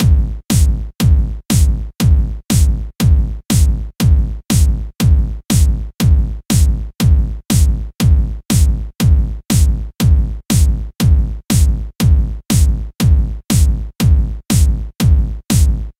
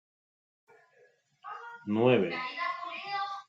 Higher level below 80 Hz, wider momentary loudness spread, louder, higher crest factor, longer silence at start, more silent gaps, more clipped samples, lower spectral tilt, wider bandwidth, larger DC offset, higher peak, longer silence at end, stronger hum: first, -14 dBFS vs -82 dBFS; second, 3 LU vs 19 LU; first, -15 LUFS vs -30 LUFS; second, 12 dB vs 20 dB; second, 0 s vs 1.45 s; neither; neither; second, -5.5 dB/octave vs -7.5 dB/octave; first, 16 kHz vs 7.4 kHz; neither; first, -2 dBFS vs -12 dBFS; about the same, 0.1 s vs 0.05 s; neither